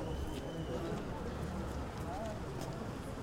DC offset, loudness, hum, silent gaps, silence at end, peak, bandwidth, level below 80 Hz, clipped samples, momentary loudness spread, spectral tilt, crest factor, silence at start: under 0.1%; -42 LUFS; none; none; 0 s; -28 dBFS; 16 kHz; -48 dBFS; under 0.1%; 2 LU; -6.5 dB/octave; 12 dB; 0 s